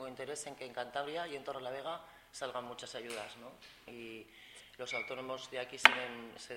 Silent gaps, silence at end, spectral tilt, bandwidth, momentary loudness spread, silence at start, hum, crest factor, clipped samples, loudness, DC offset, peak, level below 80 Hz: none; 0 s; -1.5 dB/octave; 16 kHz; 25 LU; 0 s; none; 38 dB; under 0.1%; -36 LUFS; under 0.1%; 0 dBFS; -74 dBFS